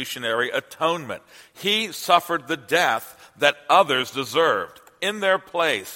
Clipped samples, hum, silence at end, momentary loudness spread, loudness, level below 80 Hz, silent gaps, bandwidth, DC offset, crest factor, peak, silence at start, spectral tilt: under 0.1%; none; 0 s; 10 LU; -22 LUFS; -70 dBFS; none; 16.5 kHz; under 0.1%; 22 dB; 0 dBFS; 0 s; -2.5 dB/octave